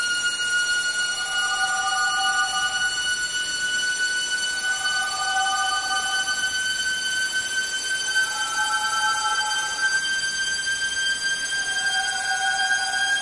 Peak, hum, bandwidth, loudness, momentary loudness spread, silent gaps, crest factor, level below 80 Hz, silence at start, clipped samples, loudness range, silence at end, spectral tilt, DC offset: -10 dBFS; none; 11.5 kHz; -22 LUFS; 2 LU; none; 14 dB; -58 dBFS; 0 s; under 0.1%; 1 LU; 0 s; 2 dB/octave; under 0.1%